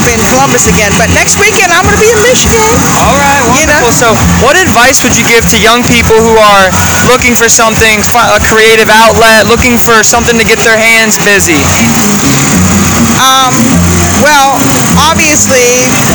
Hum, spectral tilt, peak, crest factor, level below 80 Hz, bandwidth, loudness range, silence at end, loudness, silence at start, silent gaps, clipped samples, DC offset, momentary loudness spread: none; -3 dB/octave; 0 dBFS; 4 dB; -24 dBFS; over 20 kHz; 1 LU; 0 s; -4 LUFS; 0 s; none; 8%; 0.8%; 3 LU